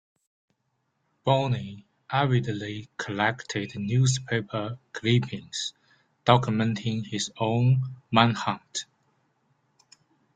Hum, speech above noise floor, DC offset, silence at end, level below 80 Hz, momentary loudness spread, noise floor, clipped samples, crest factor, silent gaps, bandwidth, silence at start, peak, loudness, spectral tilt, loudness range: none; 50 dB; under 0.1%; 1.55 s; -62 dBFS; 12 LU; -76 dBFS; under 0.1%; 26 dB; none; 9.2 kHz; 1.25 s; -2 dBFS; -26 LUFS; -5.5 dB/octave; 3 LU